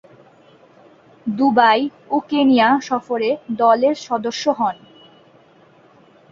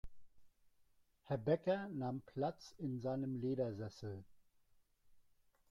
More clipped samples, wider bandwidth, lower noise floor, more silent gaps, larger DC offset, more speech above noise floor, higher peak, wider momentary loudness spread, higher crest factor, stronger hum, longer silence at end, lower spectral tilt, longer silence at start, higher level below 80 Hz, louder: neither; second, 7.4 kHz vs 12 kHz; second, -50 dBFS vs -73 dBFS; neither; neither; about the same, 34 dB vs 32 dB; first, -2 dBFS vs -24 dBFS; about the same, 10 LU vs 11 LU; about the same, 18 dB vs 20 dB; neither; first, 1.55 s vs 0.5 s; second, -4.5 dB/octave vs -8 dB/octave; first, 1.25 s vs 0.05 s; about the same, -64 dBFS vs -68 dBFS; first, -17 LUFS vs -42 LUFS